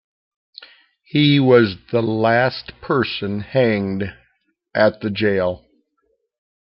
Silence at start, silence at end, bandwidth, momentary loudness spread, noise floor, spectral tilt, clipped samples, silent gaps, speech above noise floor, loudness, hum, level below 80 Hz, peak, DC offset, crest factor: 0.6 s; 1.1 s; 5.8 kHz; 12 LU; -68 dBFS; -10 dB/octave; under 0.1%; none; 51 dB; -18 LUFS; none; -56 dBFS; -2 dBFS; under 0.1%; 18 dB